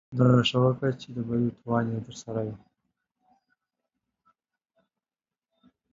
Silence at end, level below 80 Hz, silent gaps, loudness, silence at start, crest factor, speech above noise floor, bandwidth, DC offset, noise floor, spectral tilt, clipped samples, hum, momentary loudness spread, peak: 3.35 s; -62 dBFS; none; -27 LUFS; 0.1 s; 20 dB; over 64 dB; 7.6 kHz; under 0.1%; under -90 dBFS; -7 dB/octave; under 0.1%; none; 14 LU; -8 dBFS